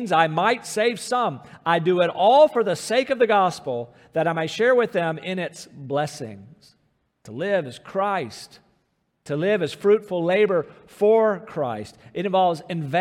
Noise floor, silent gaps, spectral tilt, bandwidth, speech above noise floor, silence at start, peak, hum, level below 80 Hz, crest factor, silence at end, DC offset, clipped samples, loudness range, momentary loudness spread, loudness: -70 dBFS; none; -5 dB/octave; 15 kHz; 48 dB; 0 s; -4 dBFS; none; -70 dBFS; 18 dB; 0 s; under 0.1%; under 0.1%; 9 LU; 12 LU; -22 LUFS